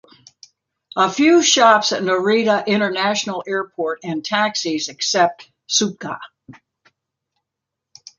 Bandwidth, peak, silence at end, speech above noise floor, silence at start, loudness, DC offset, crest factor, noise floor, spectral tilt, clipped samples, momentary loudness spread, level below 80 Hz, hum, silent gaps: 9.8 kHz; 0 dBFS; 1.65 s; 65 dB; 0.95 s; -17 LUFS; under 0.1%; 20 dB; -82 dBFS; -2.5 dB/octave; under 0.1%; 13 LU; -68 dBFS; none; none